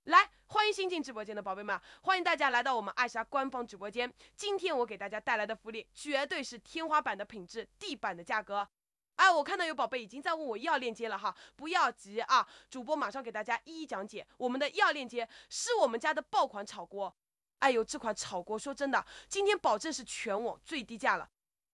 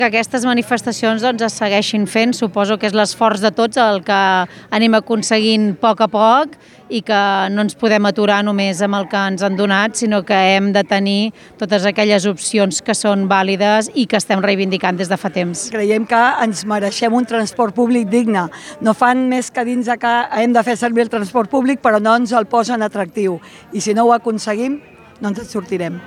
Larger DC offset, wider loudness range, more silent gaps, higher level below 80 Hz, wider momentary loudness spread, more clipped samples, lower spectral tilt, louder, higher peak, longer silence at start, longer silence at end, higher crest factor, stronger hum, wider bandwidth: neither; about the same, 4 LU vs 2 LU; neither; second, -72 dBFS vs -62 dBFS; first, 12 LU vs 7 LU; neither; second, -2 dB/octave vs -4.5 dB/octave; second, -33 LUFS vs -15 LUFS; second, -10 dBFS vs 0 dBFS; about the same, 0.05 s vs 0 s; first, 0.5 s vs 0 s; first, 24 dB vs 16 dB; neither; about the same, 12 kHz vs 13 kHz